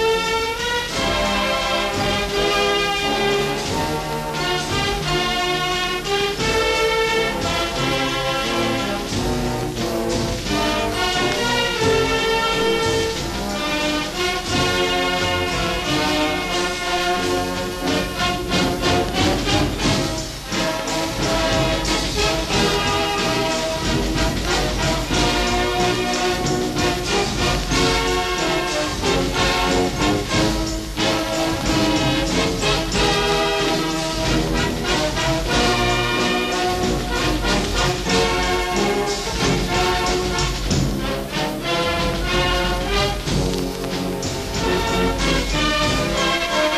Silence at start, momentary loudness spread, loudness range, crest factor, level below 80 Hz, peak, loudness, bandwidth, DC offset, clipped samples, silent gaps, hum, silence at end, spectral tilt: 0 s; 4 LU; 2 LU; 14 dB; -32 dBFS; -6 dBFS; -20 LUFS; 14.5 kHz; under 0.1%; under 0.1%; none; none; 0 s; -3.5 dB/octave